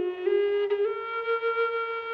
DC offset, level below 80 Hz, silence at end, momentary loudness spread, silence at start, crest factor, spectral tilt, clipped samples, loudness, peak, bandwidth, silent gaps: under 0.1%; -74 dBFS; 0 s; 4 LU; 0 s; 12 dB; -5.5 dB/octave; under 0.1%; -27 LUFS; -16 dBFS; 5.4 kHz; none